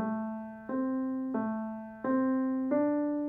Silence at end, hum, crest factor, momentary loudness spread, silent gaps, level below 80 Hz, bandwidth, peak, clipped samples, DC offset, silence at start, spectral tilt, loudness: 0 s; none; 14 dB; 9 LU; none; -70 dBFS; 2.6 kHz; -18 dBFS; under 0.1%; under 0.1%; 0 s; -11 dB/octave; -32 LUFS